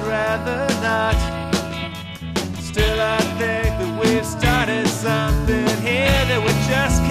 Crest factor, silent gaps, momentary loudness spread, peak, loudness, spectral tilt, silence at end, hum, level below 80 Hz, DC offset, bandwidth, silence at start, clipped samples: 18 dB; none; 8 LU; -2 dBFS; -20 LUFS; -5 dB/octave; 0 s; none; -28 dBFS; under 0.1%; 14 kHz; 0 s; under 0.1%